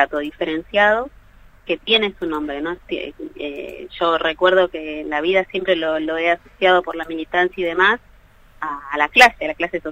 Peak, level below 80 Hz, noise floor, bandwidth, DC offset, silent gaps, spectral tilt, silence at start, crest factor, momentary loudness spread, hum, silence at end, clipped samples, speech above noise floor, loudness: 0 dBFS; -48 dBFS; -48 dBFS; 16 kHz; under 0.1%; none; -3.5 dB/octave; 0 s; 20 dB; 13 LU; none; 0 s; under 0.1%; 29 dB; -18 LUFS